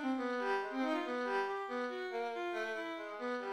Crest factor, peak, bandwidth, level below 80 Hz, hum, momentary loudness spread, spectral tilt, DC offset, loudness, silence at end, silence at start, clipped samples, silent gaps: 14 dB; -24 dBFS; 12.5 kHz; -84 dBFS; none; 4 LU; -3.5 dB/octave; under 0.1%; -38 LUFS; 0 s; 0 s; under 0.1%; none